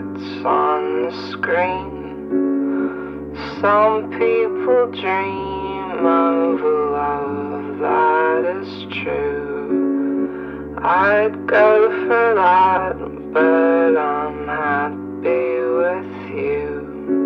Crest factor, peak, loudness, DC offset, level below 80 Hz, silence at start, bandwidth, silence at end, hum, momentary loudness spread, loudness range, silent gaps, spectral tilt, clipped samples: 16 dB; -2 dBFS; -18 LUFS; under 0.1%; -48 dBFS; 0 s; 6 kHz; 0 s; none; 12 LU; 5 LU; none; -8 dB/octave; under 0.1%